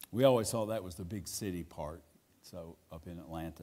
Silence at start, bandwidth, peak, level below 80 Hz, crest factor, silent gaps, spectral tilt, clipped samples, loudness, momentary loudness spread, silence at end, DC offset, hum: 0 s; 16 kHz; -12 dBFS; -60 dBFS; 24 dB; none; -5 dB/octave; under 0.1%; -35 LUFS; 22 LU; 0 s; under 0.1%; none